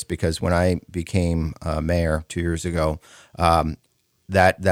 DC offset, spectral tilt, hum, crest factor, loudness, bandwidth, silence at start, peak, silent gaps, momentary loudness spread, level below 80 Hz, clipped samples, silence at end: under 0.1%; -6 dB/octave; none; 20 dB; -22 LUFS; 15.5 kHz; 0 s; -2 dBFS; none; 8 LU; -36 dBFS; under 0.1%; 0 s